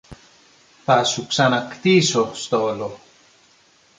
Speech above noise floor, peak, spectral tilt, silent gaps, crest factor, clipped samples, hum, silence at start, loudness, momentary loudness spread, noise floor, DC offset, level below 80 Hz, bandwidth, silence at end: 37 dB; -2 dBFS; -4 dB/octave; none; 18 dB; under 0.1%; none; 0.1 s; -19 LUFS; 12 LU; -56 dBFS; under 0.1%; -58 dBFS; 9.6 kHz; 1 s